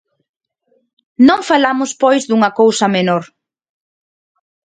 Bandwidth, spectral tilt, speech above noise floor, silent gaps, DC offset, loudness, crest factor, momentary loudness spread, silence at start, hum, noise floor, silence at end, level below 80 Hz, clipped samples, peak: 9.4 kHz; -4.5 dB/octave; 49 dB; none; under 0.1%; -13 LUFS; 16 dB; 5 LU; 1.2 s; none; -62 dBFS; 1.45 s; -60 dBFS; under 0.1%; 0 dBFS